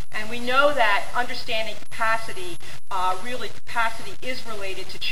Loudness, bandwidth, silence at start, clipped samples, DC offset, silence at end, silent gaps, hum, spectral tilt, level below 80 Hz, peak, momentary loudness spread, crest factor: -25 LUFS; 16 kHz; 0 s; under 0.1%; 10%; 0 s; none; none; -3 dB/octave; -52 dBFS; -4 dBFS; 14 LU; 20 dB